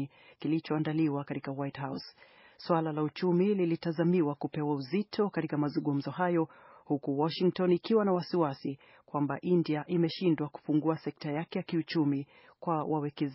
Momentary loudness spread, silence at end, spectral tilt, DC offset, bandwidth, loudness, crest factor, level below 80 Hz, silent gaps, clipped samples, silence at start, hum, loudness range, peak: 11 LU; 0 s; -6.5 dB/octave; under 0.1%; 5.8 kHz; -31 LUFS; 18 dB; -76 dBFS; none; under 0.1%; 0 s; none; 2 LU; -14 dBFS